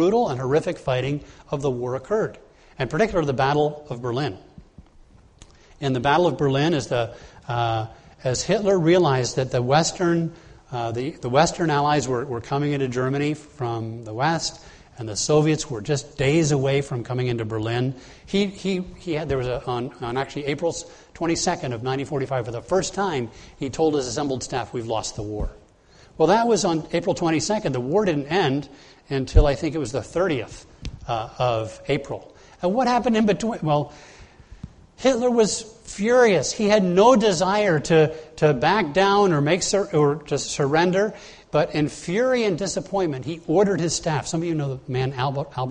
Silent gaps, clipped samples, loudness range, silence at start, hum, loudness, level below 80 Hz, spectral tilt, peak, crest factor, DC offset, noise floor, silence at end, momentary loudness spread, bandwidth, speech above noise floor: none; under 0.1%; 7 LU; 0 s; none; -22 LUFS; -38 dBFS; -5 dB/octave; 0 dBFS; 22 dB; under 0.1%; -52 dBFS; 0 s; 11 LU; 10 kHz; 30 dB